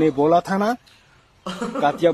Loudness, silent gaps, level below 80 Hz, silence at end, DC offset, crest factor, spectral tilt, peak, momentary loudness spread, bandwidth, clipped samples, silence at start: -21 LUFS; none; -58 dBFS; 0 s; under 0.1%; 16 dB; -6.5 dB/octave; -4 dBFS; 15 LU; 13.5 kHz; under 0.1%; 0 s